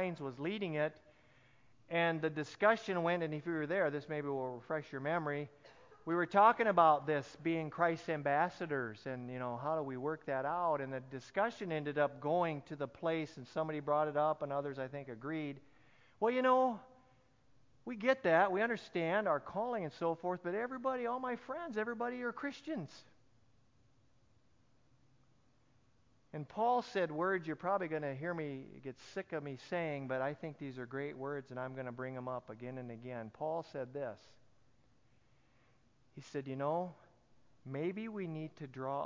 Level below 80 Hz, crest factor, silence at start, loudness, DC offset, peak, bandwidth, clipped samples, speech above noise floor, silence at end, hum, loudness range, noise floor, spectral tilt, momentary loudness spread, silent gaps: -78 dBFS; 24 dB; 0 s; -37 LUFS; under 0.1%; -14 dBFS; 7.6 kHz; under 0.1%; 36 dB; 0 s; none; 12 LU; -73 dBFS; -7 dB/octave; 14 LU; none